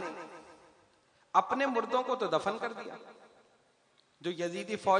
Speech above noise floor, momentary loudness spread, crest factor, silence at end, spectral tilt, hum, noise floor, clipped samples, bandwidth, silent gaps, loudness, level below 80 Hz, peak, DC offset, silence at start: 37 dB; 19 LU; 24 dB; 0 s; -4.5 dB/octave; none; -69 dBFS; under 0.1%; 10.5 kHz; none; -33 LUFS; -80 dBFS; -10 dBFS; under 0.1%; 0 s